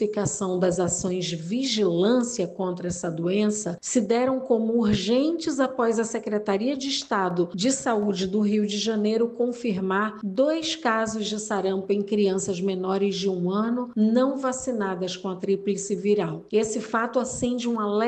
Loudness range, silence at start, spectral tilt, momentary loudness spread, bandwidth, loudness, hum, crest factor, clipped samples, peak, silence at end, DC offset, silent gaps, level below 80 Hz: 1 LU; 0 s; -4.5 dB/octave; 5 LU; 9.2 kHz; -25 LUFS; none; 16 dB; under 0.1%; -8 dBFS; 0 s; under 0.1%; none; -58 dBFS